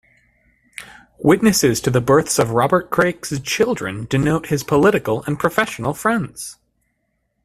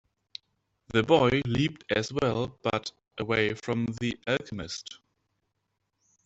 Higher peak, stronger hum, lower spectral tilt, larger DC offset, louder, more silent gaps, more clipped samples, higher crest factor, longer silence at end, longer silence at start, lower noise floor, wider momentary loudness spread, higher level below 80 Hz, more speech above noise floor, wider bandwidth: first, 0 dBFS vs -6 dBFS; neither; about the same, -5 dB/octave vs -5.5 dB/octave; neither; first, -18 LUFS vs -28 LUFS; neither; neither; about the same, 18 dB vs 22 dB; second, 0.9 s vs 1.3 s; second, 0.8 s vs 0.95 s; second, -70 dBFS vs -80 dBFS; second, 14 LU vs 19 LU; first, -48 dBFS vs -56 dBFS; about the same, 53 dB vs 52 dB; first, 16 kHz vs 8.2 kHz